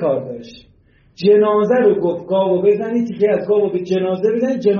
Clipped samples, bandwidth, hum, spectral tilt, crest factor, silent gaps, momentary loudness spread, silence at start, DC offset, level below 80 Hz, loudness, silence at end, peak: under 0.1%; 6.6 kHz; none; -6.5 dB/octave; 12 dB; none; 7 LU; 0 s; under 0.1%; -58 dBFS; -16 LUFS; 0 s; -4 dBFS